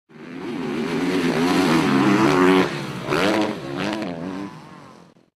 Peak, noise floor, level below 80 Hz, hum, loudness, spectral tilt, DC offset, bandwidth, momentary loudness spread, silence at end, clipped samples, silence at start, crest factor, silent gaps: -4 dBFS; -48 dBFS; -56 dBFS; none; -20 LUFS; -5.5 dB/octave; under 0.1%; 14.5 kHz; 16 LU; 0.4 s; under 0.1%; 0.15 s; 16 dB; none